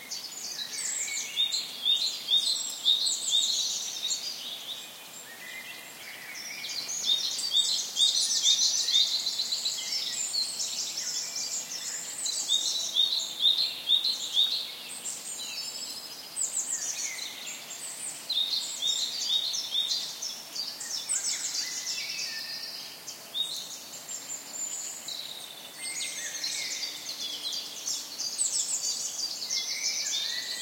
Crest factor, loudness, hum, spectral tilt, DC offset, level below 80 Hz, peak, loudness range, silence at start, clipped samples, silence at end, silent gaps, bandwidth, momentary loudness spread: 20 dB; -28 LUFS; none; 2.5 dB/octave; under 0.1%; -84 dBFS; -10 dBFS; 9 LU; 0 s; under 0.1%; 0 s; none; 16.5 kHz; 14 LU